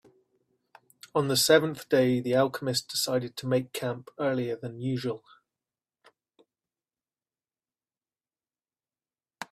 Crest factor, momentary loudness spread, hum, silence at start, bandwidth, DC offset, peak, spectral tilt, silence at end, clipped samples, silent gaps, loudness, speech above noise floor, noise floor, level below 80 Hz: 24 dB; 12 LU; none; 1.15 s; 15.5 kHz; under 0.1%; -6 dBFS; -4 dB/octave; 0.1 s; under 0.1%; none; -27 LUFS; over 63 dB; under -90 dBFS; -70 dBFS